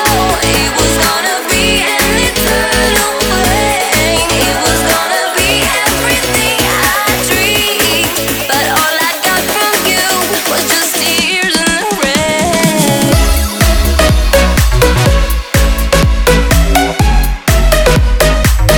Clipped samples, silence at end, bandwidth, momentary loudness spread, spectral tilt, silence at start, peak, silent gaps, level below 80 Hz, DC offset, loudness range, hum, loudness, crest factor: under 0.1%; 0 s; over 20 kHz; 2 LU; -3 dB/octave; 0 s; 0 dBFS; none; -16 dBFS; under 0.1%; 1 LU; none; -10 LUFS; 10 dB